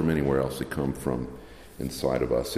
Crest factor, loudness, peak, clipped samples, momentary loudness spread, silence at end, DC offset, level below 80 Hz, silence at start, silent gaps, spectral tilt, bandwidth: 16 dB; -29 LUFS; -12 dBFS; under 0.1%; 14 LU; 0 s; under 0.1%; -44 dBFS; 0 s; none; -6 dB/octave; 15.5 kHz